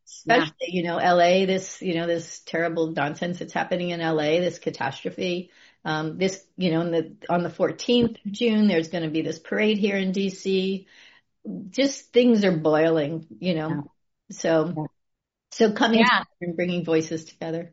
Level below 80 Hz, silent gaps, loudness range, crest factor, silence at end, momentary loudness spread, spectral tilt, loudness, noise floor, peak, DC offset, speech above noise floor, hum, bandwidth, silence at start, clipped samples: -66 dBFS; none; 3 LU; 20 dB; 0.05 s; 12 LU; -4 dB/octave; -24 LUFS; -80 dBFS; -4 dBFS; under 0.1%; 56 dB; none; 8 kHz; 0.1 s; under 0.1%